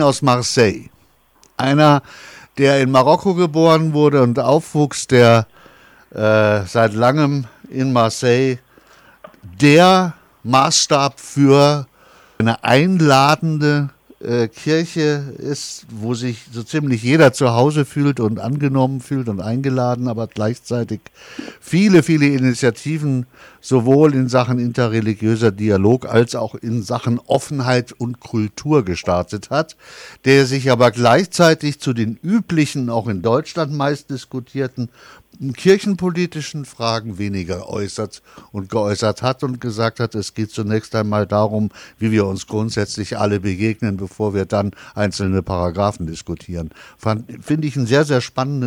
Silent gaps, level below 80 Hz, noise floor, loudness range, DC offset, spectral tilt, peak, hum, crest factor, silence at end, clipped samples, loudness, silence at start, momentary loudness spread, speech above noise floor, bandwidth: none; -50 dBFS; -55 dBFS; 7 LU; under 0.1%; -5.5 dB/octave; -2 dBFS; none; 14 dB; 0 s; under 0.1%; -17 LUFS; 0 s; 14 LU; 38 dB; 16.5 kHz